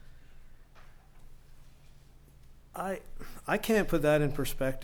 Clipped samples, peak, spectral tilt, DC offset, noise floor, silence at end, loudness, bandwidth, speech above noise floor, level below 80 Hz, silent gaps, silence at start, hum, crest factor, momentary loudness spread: under 0.1%; -14 dBFS; -5.5 dB/octave; under 0.1%; -55 dBFS; 0 s; -30 LUFS; 19.5 kHz; 25 dB; -44 dBFS; none; 0.05 s; none; 18 dB; 17 LU